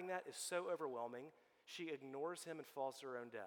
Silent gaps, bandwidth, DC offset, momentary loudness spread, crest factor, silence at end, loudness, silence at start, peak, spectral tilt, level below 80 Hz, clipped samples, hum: none; 18 kHz; under 0.1%; 12 LU; 18 dB; 0 s; -48 LUFS; 0 s; -30 dBFS; -3 dB/octave; under -90 dBFS; under 0.1%; none